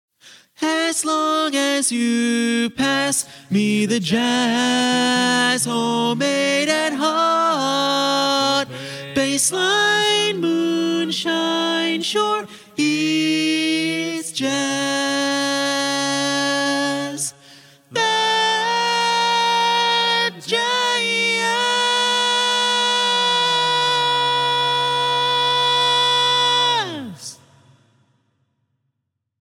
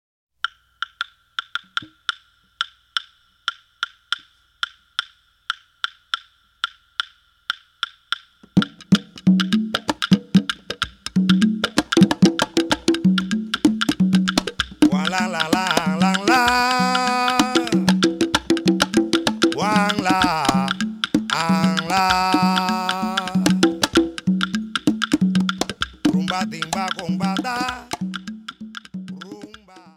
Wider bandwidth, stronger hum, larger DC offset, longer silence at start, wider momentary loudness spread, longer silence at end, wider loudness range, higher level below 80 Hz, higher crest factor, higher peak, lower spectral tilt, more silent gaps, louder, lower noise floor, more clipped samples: about the same, 16.5 kHz vs 15.5 kHz; neither; neither; second, 0.25 s vs 0.45 s; second, 6 LU vs 12 LU; first, 2.1 s vs 0.5 s; second, 3 LU vs 11 LU; second, -66 dBFS vs -50 dBFS; second, 14 dB vs 20 dB; second, -6 dBFS vs 0 dBFS; second, -2.5 dB/octave vs -4.5 dB/octave; neither; about the same, -18 LUFS vs -20 LUFS; first, -76 dBFS vs -47 dBFS; neither